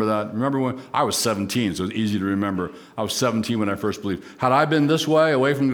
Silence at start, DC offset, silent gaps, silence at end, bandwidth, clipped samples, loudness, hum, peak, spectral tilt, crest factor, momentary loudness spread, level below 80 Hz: 0 s; under 0.1%; none; 0 s; over 20 kHz; under 0.1%; -22 LUFS; none; -4 dBFS; -5 dB/octave; 18 dB; 8 LU; -58 dBFS